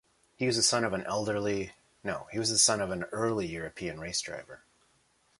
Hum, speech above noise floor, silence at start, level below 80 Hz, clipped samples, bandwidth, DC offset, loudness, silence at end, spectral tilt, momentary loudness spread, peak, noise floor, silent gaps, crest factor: none; 38 dB; 0.4 s; -60 dBFS; under 0.1%; 11.5 kHz; under 0.1%; -29 LUFS; 0.85 s; -2.5 dB/octave; 14 LU; -10 dBFS; -69 dBFS; none; 22 dB